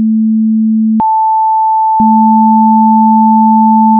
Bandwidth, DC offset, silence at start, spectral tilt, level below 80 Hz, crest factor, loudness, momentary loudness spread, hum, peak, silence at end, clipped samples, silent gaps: 1.2 kHz; under 0.1%; 0 s; -13.5 dB/octave; -52 dBFS; 6 dB; -8 LUFS; 3 LU; none; 0 dBFS; 0 s; under 0.1%; none